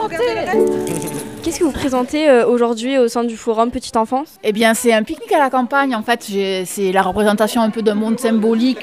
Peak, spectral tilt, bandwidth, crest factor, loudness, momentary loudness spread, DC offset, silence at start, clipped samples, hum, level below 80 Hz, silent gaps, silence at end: 0 dBFS; -4.5 dB/octave; 16 kHz; 16 dB; -16 LUFS; 7 LU; 0.2%; 0 s; under 0.1%; none; -46 dBFS; none; 0 s